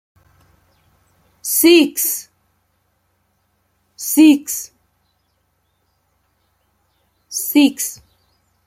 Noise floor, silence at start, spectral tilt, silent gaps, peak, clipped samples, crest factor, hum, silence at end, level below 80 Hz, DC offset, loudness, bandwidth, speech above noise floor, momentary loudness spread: -66 dBFS; 1.45 s; -1.5 dB/octave; none; -2 dBFS; under 0.1%; 18 dB; none; 0.7 s; -66 dBFS; under 0.1%; -15 LUFS; 16.5 kHz; 52 dB; 17 LU